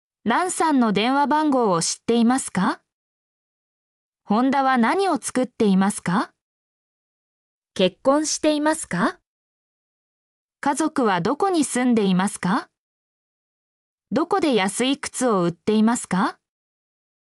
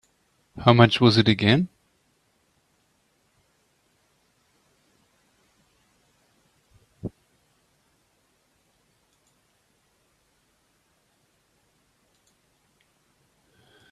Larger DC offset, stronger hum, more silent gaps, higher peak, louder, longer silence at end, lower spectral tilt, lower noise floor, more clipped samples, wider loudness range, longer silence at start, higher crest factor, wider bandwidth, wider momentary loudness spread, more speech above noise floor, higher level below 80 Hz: neither; neither; first, 2.93-4.13 s, 6.41-7.62 s, 9.27-10.49 s, 12.78-13.98 s vs none; second, -8 dBFS vs 0 dBFS; about the same, -21 LUFS vs -19 LUFS; second, 0.9 s vs 6.85 s; second, -4.5 dB/octave vs -7 dB/octave; first, under -90 dBFS vs -68 dBFS; neither; second, 3 LU vs 26 LU; second, 0.25 s vs 0.55 s; second, 14 dB vs 28 dB; first, 13.5 kHz vs 11 kHz; second, 6 LU vs 23 LU; first, over 70 dB vs 50 dB; second, -64 dBFS vs -58 dBFS